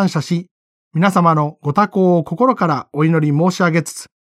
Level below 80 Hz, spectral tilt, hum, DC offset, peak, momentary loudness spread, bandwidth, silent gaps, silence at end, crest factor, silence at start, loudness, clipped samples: -62 dBFS; -7 dB/octave; none; under 0.1%; -2 dBFS; 7 LU; 13.5 kHz; 0.51-0.91 s; 0.25 s; 14 dB; 0 s; -16 LUFS; under 0.1%